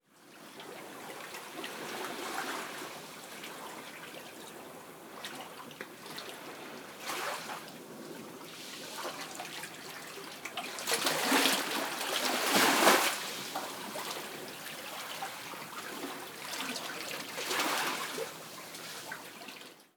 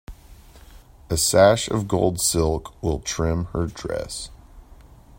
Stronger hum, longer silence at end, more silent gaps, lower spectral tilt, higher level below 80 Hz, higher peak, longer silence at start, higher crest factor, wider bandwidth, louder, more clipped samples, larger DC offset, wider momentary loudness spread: neither; second, 0.1 s vs 0.45 s; neither; second, -1 dB/octave vs -4 dB/octave; second, -84 dBFS vs -40 dBFS; second, -10 dBFS vs -4 dBFS; about the same, 0.15 s vs 0.1 s; first, 28 dB vs 20 dB; first, over 20 kHz vs 16.5 kHz; second, -34 LUFS vs -22 LUFS; neither; neither; first, 18 LU vs 14 LU